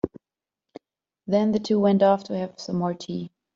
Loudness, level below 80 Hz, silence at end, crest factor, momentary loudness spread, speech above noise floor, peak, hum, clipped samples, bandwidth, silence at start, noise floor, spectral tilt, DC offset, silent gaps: -24 LUFS; -62 dBFS; 0.3 s; 18 dB; 14 LU; 67 dB; -8 dBFS; none; under 0.1%; 7.6 kHz; 0.05 s; -90 dBFS; -7.5 dB/octave; under 0.1%; none